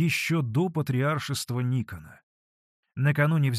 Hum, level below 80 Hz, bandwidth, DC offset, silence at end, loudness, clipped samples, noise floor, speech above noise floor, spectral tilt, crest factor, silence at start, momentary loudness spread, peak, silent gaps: none; -62 dBFS; 14 kHz; under 0.1%; 0 s; -26 LUFS; under 0.1%; under -90 dBFS; over 64 dB; -6 dB/octave; 18 dB; 0 s; 11 LU; -8 dBFS; 2.23-2.83 s